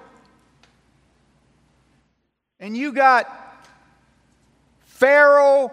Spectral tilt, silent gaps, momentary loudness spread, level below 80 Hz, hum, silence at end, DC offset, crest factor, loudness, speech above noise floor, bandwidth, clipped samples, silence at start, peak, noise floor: -4 dB/octave; none; 21 LU; -68 dBFS; none; 0 s; under 0.1%; 18 dB; -15 LUFS; 57 dB; 10 kHz; under 0.1%; 2.6 s; -2 dBFS; -72 dBFS